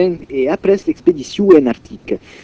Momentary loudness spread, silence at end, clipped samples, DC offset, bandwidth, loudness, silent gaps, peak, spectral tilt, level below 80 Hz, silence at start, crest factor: 14 LU; 0.25 s; 0.5%; under 0.1%; 8 kHz; -15 LUFS; none; 0 dBFS; -7 dB/octave; -46 dBFS; 0 s; 14 dB